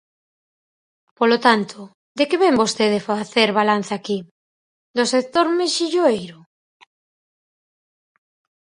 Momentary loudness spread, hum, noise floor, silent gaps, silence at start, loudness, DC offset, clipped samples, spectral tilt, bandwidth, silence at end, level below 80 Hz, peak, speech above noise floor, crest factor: 11 LU; none; under -90 dBFS; 1.95-2.15 s, 4.31-4.94 s; 1.2 s; -19 LUFS; under 0.1%; under 0.1%; -3.5 dB/octave; 11 kHz; 2.35 s; -66 dBFS; 0 dBFS; over 72 dB; 22 dB